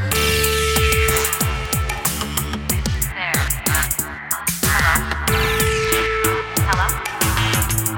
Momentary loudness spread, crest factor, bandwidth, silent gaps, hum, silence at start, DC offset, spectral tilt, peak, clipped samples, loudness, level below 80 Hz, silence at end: 6 LU; 18 dB; 19 kHz; none; none; 0 s; under 0.1%; -3 dB/octave; -2 dBFS; under 0.1%; -18 LUFS; -28 dBFS; 0 s